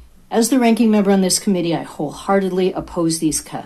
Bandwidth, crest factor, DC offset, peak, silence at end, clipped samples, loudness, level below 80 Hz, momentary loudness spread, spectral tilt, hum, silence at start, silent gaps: 15 kHz; 14 dB; under 0.1%; -4 dBFS; 0 s; under 0.1%; -17 LUFS; -48 dBFS; 8 LU; -4.5 dB/octave; none; 0.3 s; none